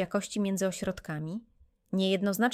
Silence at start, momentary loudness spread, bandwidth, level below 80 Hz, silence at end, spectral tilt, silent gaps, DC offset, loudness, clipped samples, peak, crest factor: 0 s; 10 LU; 16 kHz; -60 dBFS; 0 s; -5 dB/octave; none; under 0.1%; -31 LUFS; under 0.1%; -12 dBFS; 18 dB